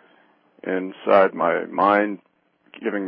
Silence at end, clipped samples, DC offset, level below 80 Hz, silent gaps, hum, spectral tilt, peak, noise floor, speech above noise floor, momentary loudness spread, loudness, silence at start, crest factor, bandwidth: 0 s; under 0.1%; under 0.1%; -70 dBFS; none; none; -10 dB/octave; -4 dBFS; -58 dBFS; 38 dB; 14 LU; -21 LUFS; 0.65 s; 18 dB; 5.4 kHz